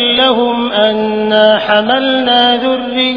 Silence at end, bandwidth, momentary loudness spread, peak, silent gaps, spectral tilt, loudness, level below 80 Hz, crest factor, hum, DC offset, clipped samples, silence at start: 0 s; 5.4 kHz; 4 LU; 0 dBFS; none; -6 dB/octave; -11 LUFS; -48 dBFS; 10 dB; none; under 0.1%; 0.2%; 0 s